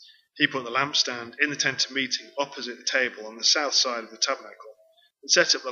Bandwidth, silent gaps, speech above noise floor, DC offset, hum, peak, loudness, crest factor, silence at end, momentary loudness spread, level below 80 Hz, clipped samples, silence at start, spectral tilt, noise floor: 7.6 kHz; none; 35 dB; under 0.1%; none; -4 dBFS; -24 LUFS; 22 dB; 0 s; 11 LU; -86 dBFS; under 0.1%; 0.35 s; -0.5 dB/octave; -61 dBFS